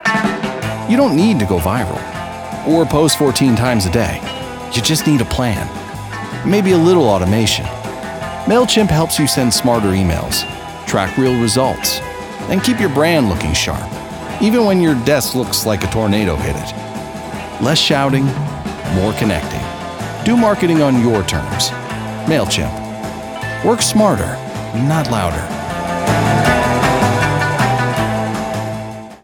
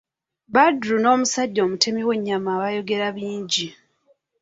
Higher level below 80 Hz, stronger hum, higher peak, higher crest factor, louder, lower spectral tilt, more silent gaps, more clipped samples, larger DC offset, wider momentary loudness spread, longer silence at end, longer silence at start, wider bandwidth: first, -36 dBFS vs -66 dBFS; neither; about the same, 0 dBFS vs -2 dBFS; about the same, 16 dB vs 20 dB; first, -15 LUFS vs -21 LUFS; first, -5 dB/octave vs -3 dB/octave; neither; neither; neither; first, 13 LU vs 7 LU; second, 0.05 s vs 0.7 s; second, 0 s vs 0.5 s; first, over 20 kHz vs 8 kHz